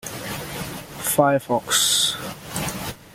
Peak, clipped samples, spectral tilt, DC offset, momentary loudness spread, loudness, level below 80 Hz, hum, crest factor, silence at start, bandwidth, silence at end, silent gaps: -2 dBFS; under 0.1%; -2.5 dB/octave; under 0.1%; 14 LU; -21 LUFS; -50 dBFS; none; 22 dB; 0.05 s; 17 kHz; 0 s; none